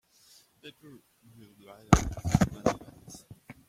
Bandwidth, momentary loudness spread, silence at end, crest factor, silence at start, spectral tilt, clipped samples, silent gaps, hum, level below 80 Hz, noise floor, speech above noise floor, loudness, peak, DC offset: 16 kHz; 25 LU; 0.15 s; 30 dB; 0.65 s; -6 dB/octave; under 0.1%; none; none; -42 dBFS; -61 dBFS; 31 dB; -28 LUFS; -2 dBFS; under 0.1%